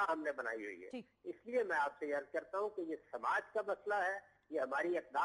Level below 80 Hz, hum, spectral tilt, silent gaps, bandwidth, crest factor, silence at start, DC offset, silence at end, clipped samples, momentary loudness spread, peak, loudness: -84 dBFS; none; -4.5 dB/octave; none; 11.5 kHz; 14 dB; 0 s; under 0.1%; 0 s; under 0.1%; 11 LU; -26 dBFS; -40 LUFS